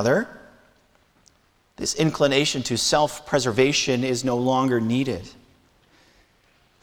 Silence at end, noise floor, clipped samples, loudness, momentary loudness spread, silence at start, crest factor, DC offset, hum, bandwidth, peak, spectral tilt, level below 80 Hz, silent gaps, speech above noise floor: 1.5 s; -62 dBFS; under 0.1%; -22 LUFS; 8 LU; 0 s; 18 dB; under 0.1%; none; 18.5 kHz; -6 dBFS; -4 dB/octave; -54 dBFS; none; 40 dB